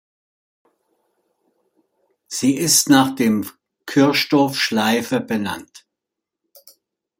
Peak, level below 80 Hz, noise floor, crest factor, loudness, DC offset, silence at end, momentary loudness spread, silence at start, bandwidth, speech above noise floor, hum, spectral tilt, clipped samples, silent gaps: 0 dBFS; -64 dBFS; -83 dBFS; 20 dB; -17 LUFS; under 0.1%; 1.4 s; 14 LU; 2.3 s; 16.5 kHz; 66 dB; none; -3.5 dB/octave; under 0.1%; none